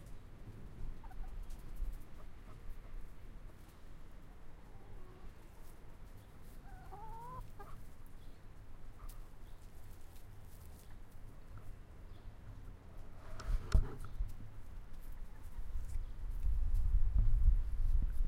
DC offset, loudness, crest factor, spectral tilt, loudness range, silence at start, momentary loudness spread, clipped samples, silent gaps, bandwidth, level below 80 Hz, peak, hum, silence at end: under 0.1%; -44 LUFS; 22 dB; -6.5 dB/octave; 16 LU; 0 s; 21 LU; under 0.1%; none; 7.6 kHz; -40 dBFS; -16 dBFS; none; 0 s